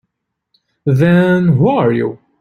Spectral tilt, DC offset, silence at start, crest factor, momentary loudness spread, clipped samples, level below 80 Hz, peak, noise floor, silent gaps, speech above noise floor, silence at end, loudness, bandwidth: -9 dB/octave; under 0.1%; 0.85 s; 12 dB; 10 LU; under 0.1%; -50 dBFS; -2 dBFS; -73 dBFS; none; 62 dB; 0.25 s; -13 LUFS; 6.4 kHz